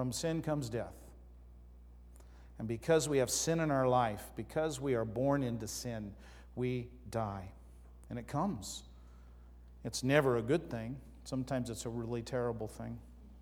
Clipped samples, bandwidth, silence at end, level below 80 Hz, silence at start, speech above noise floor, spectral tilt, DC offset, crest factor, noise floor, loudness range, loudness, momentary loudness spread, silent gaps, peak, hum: under 0.1%; 19 kHz; 0 s; -56 dBFS; 0 s; 20 dB; -5 dB/octave; under 0.1%; 24 dB; -55 dBFS; 8 LU; -36 LUFS; 17 LU; none; -12 dBFS; 60 Hz at -55 dBFS